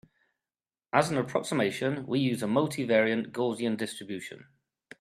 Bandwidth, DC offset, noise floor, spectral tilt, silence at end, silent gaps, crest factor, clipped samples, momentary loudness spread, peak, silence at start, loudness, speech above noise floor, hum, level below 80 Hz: 14 kHz; under 0.1%; under -90 dBFS; -5.5 dB/octave; 0.6 s; none; 24 dB; under 0.1%; 11 LU; -6 dBFS; 0.95 s; -29 LUFS; over 62 dB; none; -72 dBFS